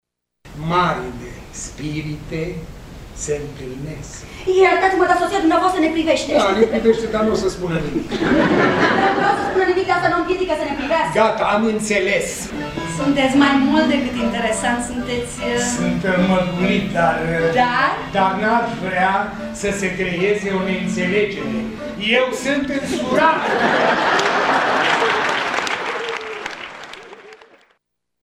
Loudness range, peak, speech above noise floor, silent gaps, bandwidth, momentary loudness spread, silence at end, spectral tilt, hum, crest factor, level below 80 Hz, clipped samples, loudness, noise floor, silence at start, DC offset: 4 LU; -2 dBFS; 53 dB; none; 15 kHz; 13 LU; 0.85 s; -4.5 dB/octave; none; 18 dB; -42 dBFS; under 0.1%; -18 LUFS; -70 dBFS; 0.45 s; under 0.1%